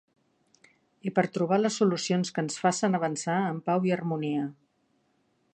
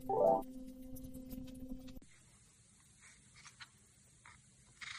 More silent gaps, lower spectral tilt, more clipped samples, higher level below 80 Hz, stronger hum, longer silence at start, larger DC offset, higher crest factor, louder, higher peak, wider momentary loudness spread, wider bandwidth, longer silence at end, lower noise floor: neither; about the same, -5.5 dB/octave vs -5 dB/octave; neither; second, -78 dBFS vs -60 dBFS; neither; first, 1.05 s vs 0 s; neither; about the same, 20 dB vs 24 dB; first, -28 LUFS vs -40 LUFS; first, -8 dBFS vs -20 dBFS; second, 6 LU vs 30 LU; second, 9.6 kHz vs 15 kHz; first, 1 s vs 0 s; first, -71 dBFS vs -66 dBFS